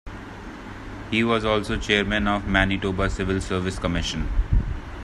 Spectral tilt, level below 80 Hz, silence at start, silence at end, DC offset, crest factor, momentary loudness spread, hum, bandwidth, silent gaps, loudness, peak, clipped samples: -5.5 dB/octave; -30 dBFS; 0.05 s; 0 s; under 0.1%; 22 dB; 17 LU; none; 11.5 kHz; none; -24 LUFS; -2 dBFS; under 0.1%